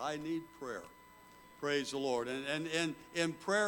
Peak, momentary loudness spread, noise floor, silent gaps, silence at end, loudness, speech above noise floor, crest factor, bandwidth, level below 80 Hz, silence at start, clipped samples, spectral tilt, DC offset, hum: -20 dBFS; 12 LU; -59 dBFS; none; 0 s; -37 LUFS; 22 dB; 18 dB; 19 kHz; -74 dBFS; 0 s; under 0.1%; -3.5 dB/octave; under 0.1%; none